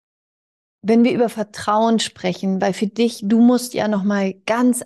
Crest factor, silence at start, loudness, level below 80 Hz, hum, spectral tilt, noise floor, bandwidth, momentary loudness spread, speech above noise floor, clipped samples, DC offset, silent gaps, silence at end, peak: 12 dB; 0.85 s; -18 LUFS; -64 dBFS; none; -5 dB/octave; under -90 dBFS; 12.5 kHz; 7 LU; over 72 dB; under 0.1%; under 0.1%; none; 0 s; -6 dBFS